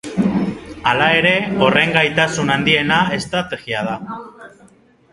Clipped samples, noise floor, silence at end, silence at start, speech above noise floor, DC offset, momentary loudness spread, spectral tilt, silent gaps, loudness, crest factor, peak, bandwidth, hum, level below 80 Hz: under 0.1%; -50 dBFS; 0.65 s; 0.05 s; 33 dB; under 0.1%; 11 LU; -4.5 dB/octave; none; -16 LUFS; 18 dB; 0 dBFS; 11.5 kHz; none; -48 dBFS